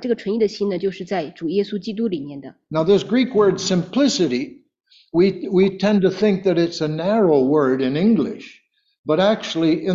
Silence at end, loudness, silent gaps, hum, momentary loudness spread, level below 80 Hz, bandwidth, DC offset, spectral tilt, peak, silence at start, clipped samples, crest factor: 0 s; -19 LUFS; 8.99-9.04 s; none; 9 LU; -58 dBFS; 7.8 kHz; under 0.1%; -6 dB/octave; -4 dBFS; 0 s; under 0.1%; 14 dB